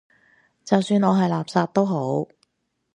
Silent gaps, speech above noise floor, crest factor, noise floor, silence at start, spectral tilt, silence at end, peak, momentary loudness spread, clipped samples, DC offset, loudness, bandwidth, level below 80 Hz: none; 48 dB; 20 dB; -69 dBFS; 0.65 s; -7 dB/octave; 0.7 s; -2 dBFS; 8 LU; under 0.1%; under 0.1%; -22 LUFS; 10 kHz; -68 dBFS